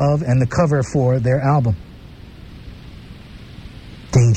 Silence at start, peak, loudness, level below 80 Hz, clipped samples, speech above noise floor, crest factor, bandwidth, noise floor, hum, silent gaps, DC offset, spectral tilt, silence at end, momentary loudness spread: 0 s; 0 dBFS; -17 LUFS; -38 dBFS; under 0.1%; 22 dB; 18 dB; 8.8 kHz; -38 dBFS; none; none; under 0.1%; -7.5 dB/octave; 0 s; 23 LU